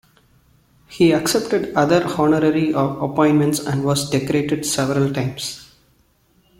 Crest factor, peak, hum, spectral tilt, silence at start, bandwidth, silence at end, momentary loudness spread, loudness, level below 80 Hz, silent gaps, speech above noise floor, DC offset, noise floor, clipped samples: 18 dB; -2 dBFS; none; -5.5 dB/octave; 0.9 s; 16.5 kHz; 0.95 s; 6 LU; -18 LUFS; -52 dBFS; none; 41 dB; under 0.1%; -59 dBFS; under 0.1%